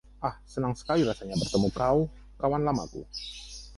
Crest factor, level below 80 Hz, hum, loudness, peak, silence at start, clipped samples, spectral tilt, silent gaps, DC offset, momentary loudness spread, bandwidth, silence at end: 18 dB; -48 dBFS; 50 Hz at -45 dBFS; -29 LUFS; -12 dBFS; 0.2 s; under 0.1%; -6 dB/octave; none; under 0.1%; 12 LU; 11.5 kHz; 0 s